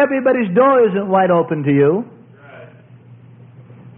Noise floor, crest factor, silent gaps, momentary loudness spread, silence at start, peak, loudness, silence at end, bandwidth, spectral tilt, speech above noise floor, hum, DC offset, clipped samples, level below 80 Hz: -42 dBFS; 14 dB; none; 4 LU; 0 s; -2 dBFS; -14 LUFS; 0.1 s; 3.7 kHz; -12.5 dB/octave; 28 dB; none; under 0.1%; under 0.1%; -62 dBFS